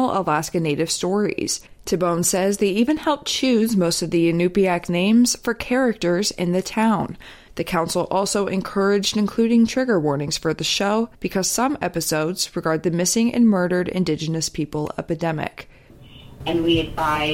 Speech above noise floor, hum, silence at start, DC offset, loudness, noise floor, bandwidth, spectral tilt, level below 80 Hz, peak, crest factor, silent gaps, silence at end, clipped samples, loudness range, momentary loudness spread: 24 dB; none; 0 s; under 0.1%; -21 LUFS; -45 dBFS; 16.5 kHz; -4.5 dB/octave; -46 dBFS; -6 dBFS; 14 dB; none; 0 s; under 0.1%; 3 LU; 7 LU